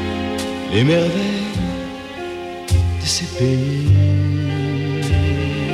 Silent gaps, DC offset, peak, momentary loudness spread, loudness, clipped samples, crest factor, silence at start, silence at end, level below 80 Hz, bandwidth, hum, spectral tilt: none; under 0.1%; -4 dBFS; 13 LU; -19 LUFS; under 0.1%; 14 dB; 0 s; 0 s; -32 dBFS; 13 kHz; none; -6 dB/octave